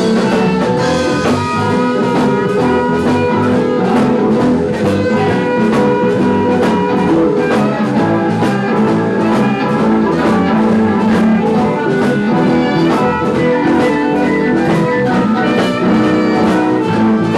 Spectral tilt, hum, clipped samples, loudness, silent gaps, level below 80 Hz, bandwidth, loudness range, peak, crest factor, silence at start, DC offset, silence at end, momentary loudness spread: -7 dB/octave; none; under 0.1%; -13 LUFS; none; -44 dBFS; 12 kHz; 1 LU; -4 dBFS; 8 dB; 0 s; 0.2%; 0 s; 2 LU